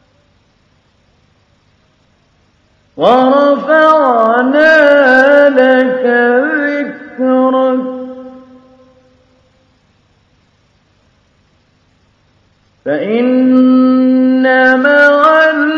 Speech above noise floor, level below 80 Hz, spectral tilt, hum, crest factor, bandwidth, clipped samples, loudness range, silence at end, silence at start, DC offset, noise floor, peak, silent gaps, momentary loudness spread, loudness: 46 dB; -58 dBFS; -5.5 dB/octave; none; 12 dB; 6.8 kHz; 0.3%; 11 LU; 0 s; 2.95 s; under 0.1%; -53 dBFS; 0 dBFS; none; 11 LU; -9 LUFS